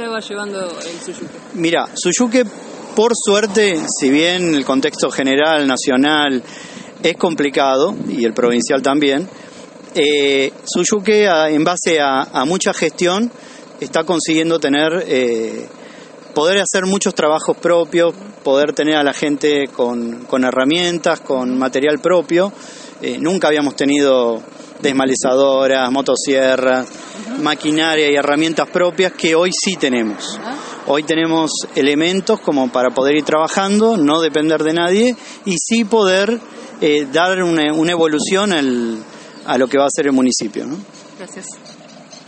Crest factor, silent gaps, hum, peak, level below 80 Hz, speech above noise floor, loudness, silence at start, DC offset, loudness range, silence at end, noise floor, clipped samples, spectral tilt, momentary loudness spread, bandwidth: 16 dB; none; none; 0 dBFS; -62 dBFS; 23 dB; -15 LUFS; 0 s; under 0.1%; 2 LU; 0.1 s; -38 dBFS; under 0.1%; -3.5 dB/octave; 12 LU; 8.8 kHz